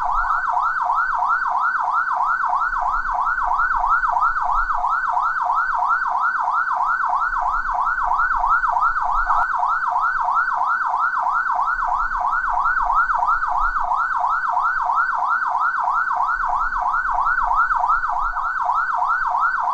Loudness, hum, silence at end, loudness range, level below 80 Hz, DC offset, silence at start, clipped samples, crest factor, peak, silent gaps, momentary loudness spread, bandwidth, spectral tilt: -19 LUFS; none; 0 s; 1 LU; -38 dBFS; under 0.1%; 0 s; under 0.1%; 12 dB; -8 dBFS; none; 3 LU; 8.4 kHz; -3 dB/octave